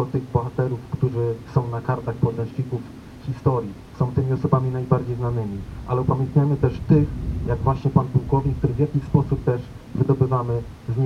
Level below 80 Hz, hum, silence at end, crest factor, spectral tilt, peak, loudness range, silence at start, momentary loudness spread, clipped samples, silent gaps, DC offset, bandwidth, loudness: -38 dBFS; none; 0 s; 20 dB; -10 dB/octave; -2 dBFS; 4 LU; 0 s; 9 LU; under 0.1%; none; under 0.1%; 6.6 kHz; -23 LUFS